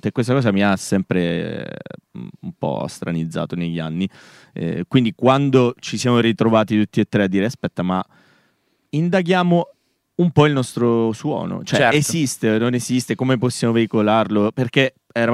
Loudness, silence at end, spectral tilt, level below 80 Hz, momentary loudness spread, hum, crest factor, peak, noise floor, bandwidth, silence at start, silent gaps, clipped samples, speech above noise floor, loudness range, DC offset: -19 LUFS; 0 s; -6 dB/octave; -58 dBFS; 11 LU; none; 18 dB; -2 dBFS; -64 dBFS; 14.5 kHz; 0.05 s; none; under 0.1%; 46 dB; 6 LU; under 0.1%